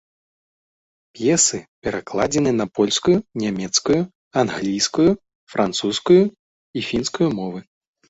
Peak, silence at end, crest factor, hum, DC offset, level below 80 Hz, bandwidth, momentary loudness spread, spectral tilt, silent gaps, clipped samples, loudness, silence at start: -2 dBFS; 0.5 s; 18 dB; none; under 0.1%; -52 dBFS; 8.2 kHz; 12 LU; -4 dB/octave; 1.68-1.82 s, 4.15-4.31 s, 5.35-5.47 s, 6.39-6.74 s; under 0.1%; -20 LUFS; 1.15 s